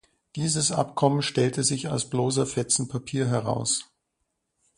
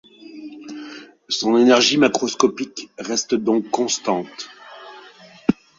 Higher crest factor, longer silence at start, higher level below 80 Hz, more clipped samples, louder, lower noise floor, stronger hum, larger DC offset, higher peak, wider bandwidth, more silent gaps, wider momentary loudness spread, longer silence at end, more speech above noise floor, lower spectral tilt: about the same, 20 dB vs 20 dB; about the same, 0.35 s vs 0.25 s; about the same, -60 dBFS vs -62 dBFS; neither; second, -25 LUFS vs -19 LUFS; first, -78 dBFS vs -45 dBFS; neither; neither; second, -6 dBFS vs 0 dBFS; first, 11.5 kHz vs 7.8 kHz; neither; second, 5 LU vs 24 LU; first, 0.95 s vs 0.25 s; first, 53 dB vs 26 dB; about the same, -4 dB/octave vs -3 dB/octave